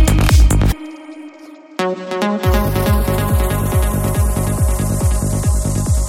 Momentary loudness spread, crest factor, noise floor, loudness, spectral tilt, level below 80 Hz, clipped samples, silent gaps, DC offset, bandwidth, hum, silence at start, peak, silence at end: 16 LU; 14 dB; -38 dBFS; -16 LUFS; -5.5 dB/octave; -18 dBFS; under 0.1%; none; under 0.1%; 17 kHz; none; 0 s; 0 dBFS; 0 s